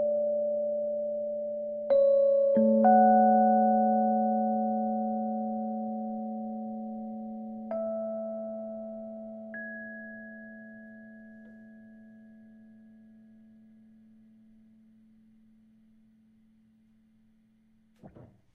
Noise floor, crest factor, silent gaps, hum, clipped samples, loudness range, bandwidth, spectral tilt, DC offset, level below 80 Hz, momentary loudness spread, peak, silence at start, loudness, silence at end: -65 dBFS; 18 dB; none; none; under 0.1%; 21 LU; 4.2 kHz; -11.5 dB/octave; under 0.1%; -76 dBFS; 22 LU; -12 dBFS; 0 s; -28 LUFS; 0.3 s